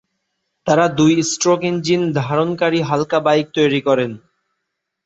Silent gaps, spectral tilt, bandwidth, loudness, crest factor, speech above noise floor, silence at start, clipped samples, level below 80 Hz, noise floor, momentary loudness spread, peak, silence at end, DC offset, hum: none; -5 dB/octave; 8.2 kHz; -17 LUFS; 16 dB; 60 dB; 0.65 s; under 0.1%; -58 dBFS; -76 dBFS; 4 LU; -2 dBFS; 0.9 s; under 0.1%; none